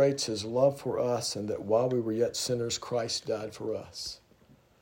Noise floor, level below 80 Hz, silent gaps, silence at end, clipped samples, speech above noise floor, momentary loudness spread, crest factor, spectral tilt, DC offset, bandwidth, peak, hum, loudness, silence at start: -61 dBFS; -68 dBFS; none; 0.65 s; under 0.1%; 31 dB; 10 LU; 18 dB; -4.5 dB/octave; under 0.1%; 16 kHz; -12 dBFS; none; -30 LUFS; 0 s